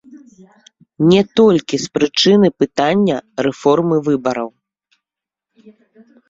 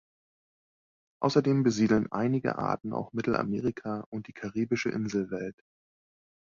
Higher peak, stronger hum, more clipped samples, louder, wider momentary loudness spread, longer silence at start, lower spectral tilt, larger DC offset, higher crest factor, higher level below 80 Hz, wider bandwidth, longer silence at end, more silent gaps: first, -2 dBFS vs -10 dBFS; neither; neither; first, -15 LUFS vs -29 LUFS; second, 9 LU vs 12 LU; second, 0.1 s vs 1.2 s; about the same, -5.5 dB/octave vs -6.5 dB/octave; neither; about the same, 16 dB vs 20 dB; first, -54 dBFS vs -62 dBFS; about the same, 7.8 kHz vs 7.4 kHz; first, 1.8 s vs 0.95 s; second, none vs 4.06-4.12 s